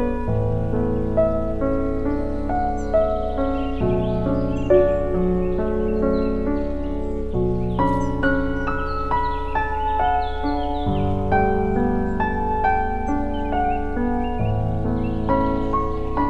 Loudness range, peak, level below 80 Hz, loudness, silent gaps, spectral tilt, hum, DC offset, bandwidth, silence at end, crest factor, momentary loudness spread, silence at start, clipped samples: 2 LU; -4 dBFS; -28 dBFS; -22 LUFS; none; -9 dB/octave; none; under 0.1%; 7.6 kHz; 0 s; 16 dB; 4 LU; 0 s; under 0.1%